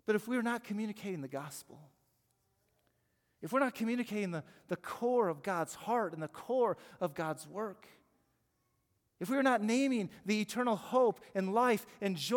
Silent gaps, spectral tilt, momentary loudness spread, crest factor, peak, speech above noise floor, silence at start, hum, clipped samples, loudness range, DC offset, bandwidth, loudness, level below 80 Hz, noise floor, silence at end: none; -5 dB/octave; 12 LU; 18 dB; -18 dBFS; 44 dB; 0.1 s; none; under 0.1%; 7 LU; under 0.1%; 18 kHz; -35 LUFS; -82 dBFS; -79 dBFS; 0 s